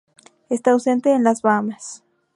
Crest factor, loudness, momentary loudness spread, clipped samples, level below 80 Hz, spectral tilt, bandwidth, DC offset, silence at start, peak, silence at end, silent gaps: 18 dB; -19 LUFS; 14 LU; under 0.1%; -74 dBFS; -5.5 dB/octave; 11.5 kHz; under 0.1%; 0.5 s; -2 dBFS; 0.4 s; none